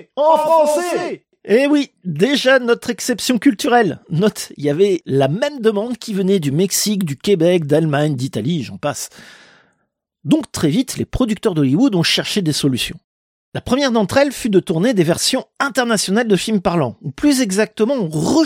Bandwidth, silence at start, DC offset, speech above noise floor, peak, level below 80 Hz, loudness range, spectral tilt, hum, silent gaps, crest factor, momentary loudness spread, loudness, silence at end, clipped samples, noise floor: 16.5 kHz; 0.15 s; under 0.1%; 54 dB; -2 dBFS; -46 dBFS; 3 LU; -5 dB/octave; none; 13.04-13.52 s; 16 dB; 8 LU; -17 LUFS; 0 s; under 0.1%; -70 dBFS